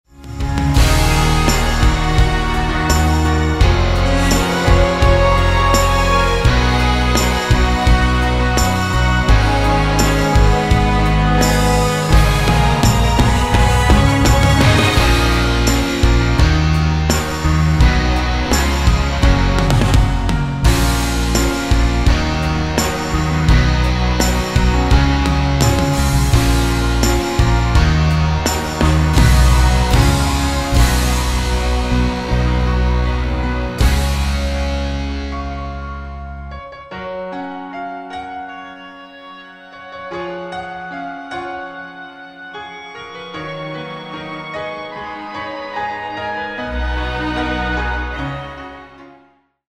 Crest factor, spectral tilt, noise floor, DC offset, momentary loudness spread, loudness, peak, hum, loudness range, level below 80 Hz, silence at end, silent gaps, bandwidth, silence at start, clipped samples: 14 dB; -5 dB/octave; -52 dBFS; under 0.1%; 15 LU; -15 LUFS; 0 dBFS; none; 15 LU; -18 dBFS; 0.7 s; none; 15.5 kHz; 0.2 s; under 0.1%